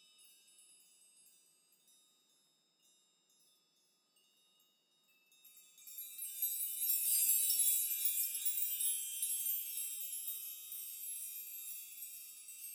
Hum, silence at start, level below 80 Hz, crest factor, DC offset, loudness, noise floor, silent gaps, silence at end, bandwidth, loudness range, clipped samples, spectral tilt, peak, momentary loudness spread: none; 0.2 s; under -90 dBFS; 24 dB; under 0.1%; -35 LUFS; -77 dBFS; none; 0 s; 17 kHz; 12 LU; under 0.1%; 6 dB/octave; -18 dBFS; 17 LU